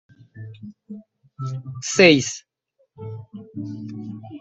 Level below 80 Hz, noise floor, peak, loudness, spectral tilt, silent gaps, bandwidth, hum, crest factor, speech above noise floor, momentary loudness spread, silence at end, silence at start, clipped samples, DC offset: -62 dBFS; -67 dBFS; -2 dBFS; -19 LUFS; -4 dB/octave; none; 8.2 kHz; none; 22 dB; 46 dB; 27 LU; 0 s; 0.35 s; under 0.1%; under 0.1%